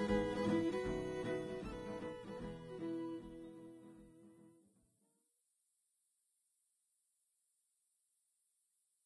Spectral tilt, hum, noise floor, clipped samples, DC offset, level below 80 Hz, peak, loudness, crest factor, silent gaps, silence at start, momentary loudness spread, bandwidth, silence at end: -6.5 dB/octave; none; -83 dBFS; under 0.1%; under 0.1%; -62 dBFS; -24 dBFS; -42 LUFS; 22 dB; none; 0 s; 22 LU; 11 kHz; 4.55 s